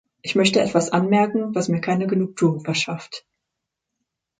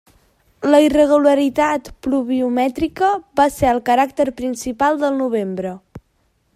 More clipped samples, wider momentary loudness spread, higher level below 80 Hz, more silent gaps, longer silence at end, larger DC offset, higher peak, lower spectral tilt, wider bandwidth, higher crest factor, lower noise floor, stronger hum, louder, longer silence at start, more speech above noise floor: neither; about the same, 9 LU vs 11 LU; second, -64 dBFS vs -46 dBFS; neither; first, 1.2 s vs 0.55 s; neither; about the same, -4 dBFS vs -2 dBFS; about the same, -5 dB/octave vs -5 dB/octave; second, 9.6 kHz vs 15 kHz; about the same, 18 dB vs 16 dB; first, -82 dBFS vs -63 dBFS; neither; second, -21 LUFS vs -17 LUFS; second, 0.25 s vs 0.6 s; first, 62 dB vs 47 dB